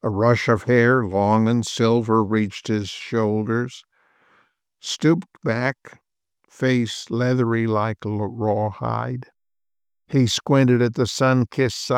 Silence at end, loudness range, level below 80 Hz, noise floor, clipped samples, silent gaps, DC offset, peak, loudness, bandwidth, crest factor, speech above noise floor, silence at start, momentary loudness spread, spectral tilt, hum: 0 s; 5 LU; -60 dBFS; under -90 dBFS; under 0.1%; none; under 0.1%; -4 dBFS; -21 LUFS; 13.5 kHz; 16 dB; over 70 dB; 0.05 s; 8 LU; -6 dB/octave; none